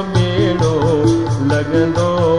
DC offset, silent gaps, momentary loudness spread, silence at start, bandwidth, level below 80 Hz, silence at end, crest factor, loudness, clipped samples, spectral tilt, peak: 1%; none; 2 LU; 0 s; 10.5 kHz; -36 dBFS; 0 s; 12 dB; -15 LUFS; under 0.1%; -7 dB/octave; -2 dBFS